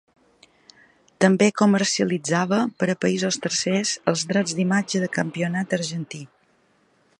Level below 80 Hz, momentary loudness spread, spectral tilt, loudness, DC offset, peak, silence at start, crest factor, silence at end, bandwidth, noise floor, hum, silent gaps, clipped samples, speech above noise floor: -68 dBFS; 8 LU; -4.5 dB/octave; -22 LUFS; under 0.1%; -2 dBFS; 1.2 s; 20 dB; 0.95 s; 11 kHz; -62 dBFS; none; none; under 0.1%; 41 dB